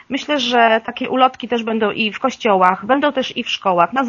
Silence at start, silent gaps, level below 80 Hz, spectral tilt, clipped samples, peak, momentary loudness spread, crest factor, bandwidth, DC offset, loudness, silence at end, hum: 0.1 s; none; -60 dBFS; -1.5 dB/octave; under 0.1%; 0 dBFS; 7 LU; 16 dB; 7.4 kHz; under 0.1%; -17 LUFS; 0 s; none